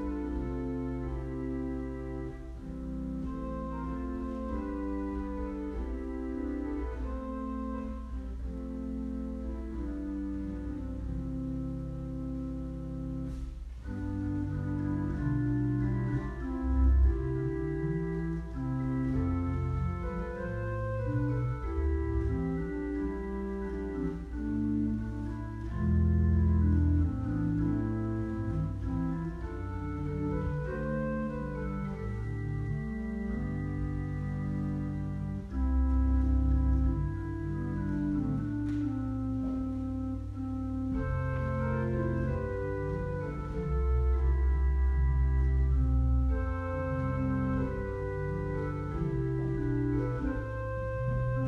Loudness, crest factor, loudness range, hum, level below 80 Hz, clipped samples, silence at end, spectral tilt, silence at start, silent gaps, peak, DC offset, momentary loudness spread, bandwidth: -33 LUFS; 14 dB; 8 LU; none; -36 dBFS; under 0.1%; 0 s; -10 dB/octave; 0 s; none; -16 dBFS; under 0.1%; 9 LU; 4.7 kHz